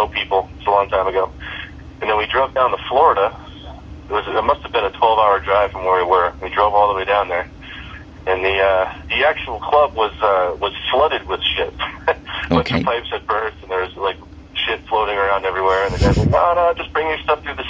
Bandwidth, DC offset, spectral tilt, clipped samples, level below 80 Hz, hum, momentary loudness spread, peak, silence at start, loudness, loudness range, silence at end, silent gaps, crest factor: 7.8 kHz; under 0.1%; -6 dB/octave; under 0.1%; -36 dBFS; none; 11 LU; 0 dBFS; 0 s; -18 LUFS; 4 LU; 0 s; none; 18 dB